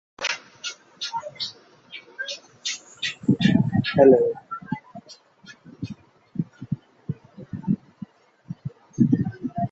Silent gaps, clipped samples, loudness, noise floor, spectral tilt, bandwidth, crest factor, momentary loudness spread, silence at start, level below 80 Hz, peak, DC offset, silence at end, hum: none; under 0.1%; -24 LUFS; -50 dBFS; -6 dB/octave; 8 kHz; 22 dB; 21 LU; 0.2 s; -56 dBFS; -2 dBFS; under 0.1%; 0.05 s; none